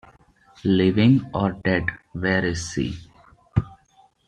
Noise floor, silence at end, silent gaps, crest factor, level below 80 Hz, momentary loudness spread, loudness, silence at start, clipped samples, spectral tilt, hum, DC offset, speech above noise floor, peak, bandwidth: -58 dBFS; 0.55 s; none; 18 dB; -46 dBFS; 12 LU; -22 LUFS; 0.65 s; under 0.1%; -6.5 dB/octave; none; under 0.1%; 37 dB; -4 dBFS; 10 kHz